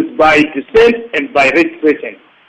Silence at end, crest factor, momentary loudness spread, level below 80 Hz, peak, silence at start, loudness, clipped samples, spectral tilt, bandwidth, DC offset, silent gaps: 0.35 s; 12 dB; 8 LU; -42 dBFS; 0 dBFS; 0 s; -11 LUFS; under 0.1%; -5 dB/octave; 9 kHz; under 0.1%; none